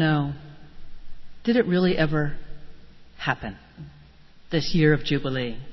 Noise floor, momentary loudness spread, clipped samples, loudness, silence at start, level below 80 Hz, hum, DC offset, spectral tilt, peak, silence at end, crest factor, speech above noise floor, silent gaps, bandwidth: -48 dBFS; 23 LU; under 0.1%; -24 LUFS; 0 s; -44 dBFS; none; under 0.1%; -7 dB/octave; -6 dBFS; 0 s; 20 dB; 25 dB; none; 6.2 kHz